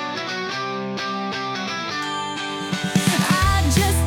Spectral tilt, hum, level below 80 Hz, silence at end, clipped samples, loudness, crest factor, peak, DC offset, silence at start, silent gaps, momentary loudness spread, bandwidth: -4 dB/octave; none; -34 dBFS; 0 s; under 0.1%; -22 LUFS; 14 dB; -8 dBFS; under 0.1%; 0 s; none; 8 LU; 19 kHz